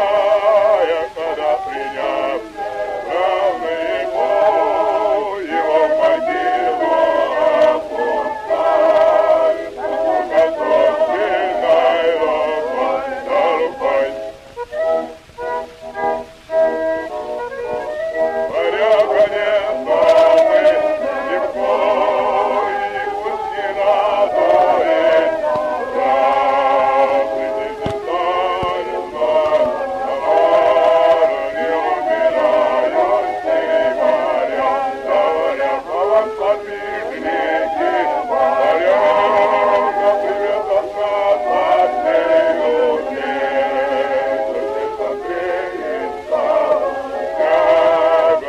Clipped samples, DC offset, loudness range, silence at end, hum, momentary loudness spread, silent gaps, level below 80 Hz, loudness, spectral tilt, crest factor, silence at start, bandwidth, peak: under 0.1%; under 0.1%; 5 LU; 0 s; none; 9 LU; none; -50 dBFS; -16 LUFS; -4.5 dB/octave; 14 dB; 0 s; 9.8 kHz; -2 dBFS